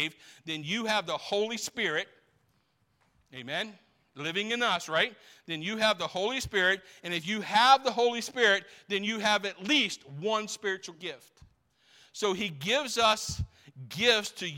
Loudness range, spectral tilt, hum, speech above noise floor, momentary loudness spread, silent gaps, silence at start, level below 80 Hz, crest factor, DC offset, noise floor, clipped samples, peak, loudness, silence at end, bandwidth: 7 LU; -2.5 dB/octave; none; 43 dB; 14 LU; none; 0 s; -60 dBFS; 22 dB; under 0.1%; -72 dBFS; under 0.1%; -8 dBFS; -28 LUFS; 0 s; 16.5 kHz